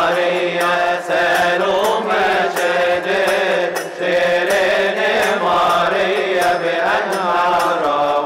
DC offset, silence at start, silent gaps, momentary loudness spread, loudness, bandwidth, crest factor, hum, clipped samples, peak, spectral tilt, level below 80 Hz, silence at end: under 0.1%; 0 s; none; 3 LU; -16 LUFS; 16 kHz; 8 dB; none; under 0.1%; -8 dBFS; -3.5 dB/octave; -54 dBFS; 0 s